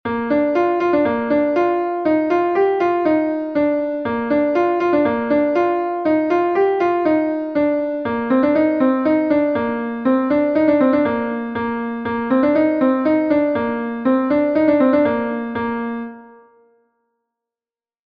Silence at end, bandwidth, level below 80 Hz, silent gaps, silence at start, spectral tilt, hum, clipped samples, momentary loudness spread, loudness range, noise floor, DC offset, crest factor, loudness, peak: 1.8 s; 5.8 kHz; -54 dBFS; none; 0.05 s; -8 dB/octave; none; under 0.1%; 7 LU; 2 LU; under -90 dBFS; under 0.1%; 14 dB; -18 LUFS; -4 dBFS